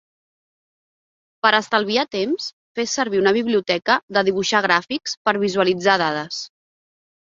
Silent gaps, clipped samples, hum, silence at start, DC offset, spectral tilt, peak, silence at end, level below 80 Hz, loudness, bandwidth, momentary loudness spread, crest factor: 2.53-2.75 s, 4.03-4.08 s, 5.17-5.25 s; under 0.1%; none; 1.45 s; under 0.1%; -3.5 dB/octave; -2 dBFS; 0.9 s; -64 dBFS; -19 LUFS; 7.6 kHz; 9 LU; 20 dB